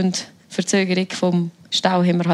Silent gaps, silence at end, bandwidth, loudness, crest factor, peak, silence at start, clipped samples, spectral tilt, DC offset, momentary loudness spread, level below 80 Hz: none; 0 s; 11.5 kHz; -20 LUFS; 18 dB; -2 dBFS; 0 s; under 0.1%; -5 dB/octave; under 0.1%; 8 LU; -70 dBFS